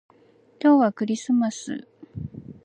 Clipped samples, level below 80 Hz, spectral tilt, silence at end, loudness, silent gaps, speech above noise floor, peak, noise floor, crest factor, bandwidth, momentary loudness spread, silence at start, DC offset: under 0.1%; -56 dBFS; -6 dB/octave; 0.15 s; -22 LUFS; none; 35 dB; -8 dBFS; -57 dBFS; 16 dB; 9.4 kHz; 19 LU; 0.65 s; under 0.1%